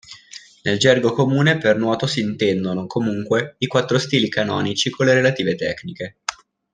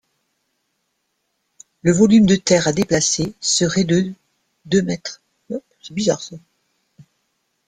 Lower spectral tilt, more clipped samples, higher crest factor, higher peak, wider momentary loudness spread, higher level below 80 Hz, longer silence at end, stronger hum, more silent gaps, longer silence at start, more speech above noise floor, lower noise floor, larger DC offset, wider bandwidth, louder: about the same, -5 dB/octave vs -4.5 dB/octave; neither; about the same, 18 dB vs 18 dB; about the same, -2 dBFS vs -2 dBFS; second, 13 LU vs 18 LU; second, -58 dBFS vs -52 dBFS; second, 0.4 s vs 1.3 s; neither; neither; second, 0.1 s vs 1.85 s; second, 24 dB vs 55 dB; second, -43 dBFS vs -72 dBFS; neither; about the same, 10 kHz vs 9.8 kHz; about the same, -19 LUFS vs -17 LUFS